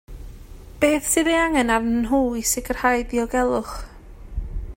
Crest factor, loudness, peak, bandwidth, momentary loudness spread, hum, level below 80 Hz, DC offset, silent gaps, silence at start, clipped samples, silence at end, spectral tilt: 18 dB; -21 LUFS; -6 dBFS; 16.5 kHz; 16 LU; none; -36 dBFS; under 0.1%; none; 0.1 s; under 0.1%; 0 s; -3.5 dB/octave